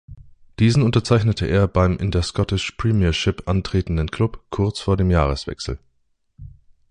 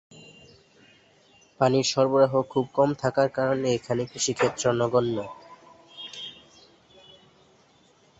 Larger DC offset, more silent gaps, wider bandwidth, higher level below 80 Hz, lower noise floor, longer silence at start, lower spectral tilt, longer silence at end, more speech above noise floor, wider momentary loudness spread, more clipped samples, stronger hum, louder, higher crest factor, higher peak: neither; neither; first, 10 kHz vs 8.2 kHz; first, -30 dBFS vs -64 dBFS; first, -66 dBFS vs -60 dBFS; second, 0.1 s vs 1.6 s; first, -6.5 dB/octave vs -4.5 dB/octave; second, 0.4 s vs 1.85 s; first, 47 dB vs 36 dB; second, 7 LU vs 17 LU; neither; neither; first, -20 LUFS vs -24 LUFS; about the same, 18 dB vs 20 dB; first, -2 dBFS vs -6 dBFS